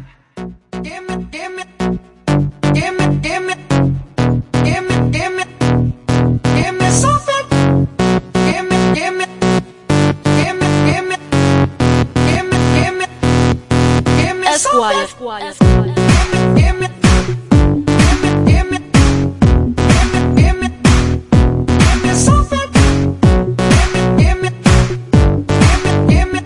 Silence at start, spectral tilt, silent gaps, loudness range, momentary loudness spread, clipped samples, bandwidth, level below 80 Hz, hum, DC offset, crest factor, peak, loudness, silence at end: 0 s; -5.5 dB/octave; none; 4 LU; 7 LU; under 0.1%; 11.5 kHz; -20 dBFS; none; under 0.1%; 12 dB; 0 dBFS; -13 LUFS; 0 s